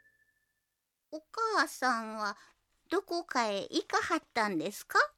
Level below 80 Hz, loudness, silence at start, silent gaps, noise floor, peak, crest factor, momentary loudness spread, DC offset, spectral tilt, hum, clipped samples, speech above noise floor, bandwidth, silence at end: -76 dBFS; -33 LUFS; 1.1 s; none; -84 dBFS; -12 dBFS; 22 dB; 10 LU; under 0.1%; -2.5 dB/octave; none; under 0.1%; 51 dB; 17 kHz; 0.05 s